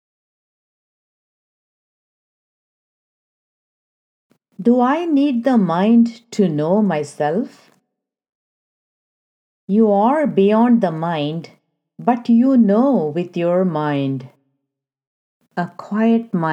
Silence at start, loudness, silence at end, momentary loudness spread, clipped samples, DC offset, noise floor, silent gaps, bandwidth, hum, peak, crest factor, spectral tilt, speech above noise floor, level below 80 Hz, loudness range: 4.6 s; -17 LUFS; 0 s; 10 LU; under 0.1%; under 0.1%; -80 dBFS; 8.29-9.68 s, 15.07-15.41 s; 9 kHz; none; 0 dBFS; 18 dB; -8 dB/octave; 64 dB; -78 dBFS; 6 LU